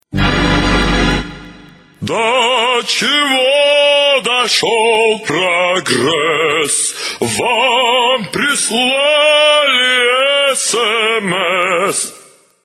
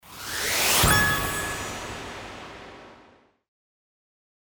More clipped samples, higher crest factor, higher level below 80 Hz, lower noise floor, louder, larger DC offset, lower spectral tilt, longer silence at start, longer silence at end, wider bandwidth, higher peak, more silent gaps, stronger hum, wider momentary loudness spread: neither; second, 12 dB vs 22 dB; first, -30 dBFS vs -42 dBFS; second, -43 dBFS vs -57 dBFS; first, -12 LUFS vs -22 LUFS; neither; about the same, -2.5 dB/octave vs -2 dB/octave; about the same, 0.1 s vs 0.05 s; second, 0.45 s vs 1.55 s; second, 16 kHz vs over 20 kHz; first, 0 dBFS vs -6 dBFS; neither; neither; second, 7 LU vs 23 LU